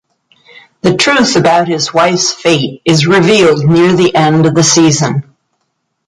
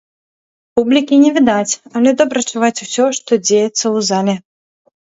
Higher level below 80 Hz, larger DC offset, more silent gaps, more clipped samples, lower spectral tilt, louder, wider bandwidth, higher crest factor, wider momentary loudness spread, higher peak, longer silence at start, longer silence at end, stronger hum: first, -48 dBFS vs -58 dBFS; neither; neither; neither; about the same, -4.5 dB/octave vs -3.5 dB/octave; first, -9 LUFS vs -14 LUFS; first, 11.5 kHz vs 8 kHz; about the same, 10 dB vs 14 dB; about the same, 5 LU vs 7 LU; about the same, 0 dBFS vs 0 dBFS; about the same, 0.85 s vs 0.75 s; first, 0.85 s vs 0.65 s; neither